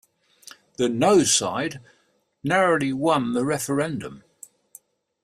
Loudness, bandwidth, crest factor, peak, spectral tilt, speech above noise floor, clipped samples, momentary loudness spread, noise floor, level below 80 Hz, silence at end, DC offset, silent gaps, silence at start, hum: -22 LUFS; 15.5 kHz; 18 dB; -6 dBFS; -3.5 dB/octave; 31 dB; under 0.1%; 16 LU; -53 dBFS; -62 dBFS; 1.05 s; under 0.1%; none; 0.8 s; none